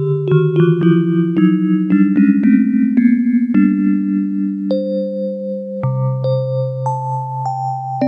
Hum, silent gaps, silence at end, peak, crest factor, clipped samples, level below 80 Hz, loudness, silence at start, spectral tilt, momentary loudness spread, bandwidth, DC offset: none; none; 0 s; 0 dBFS; 14 dB; under 0.1%; -62 dBFS; -15 LUFS; 0 s; -10.5 dB/octave; 9 LU; 6.2 kHz; under 0.1%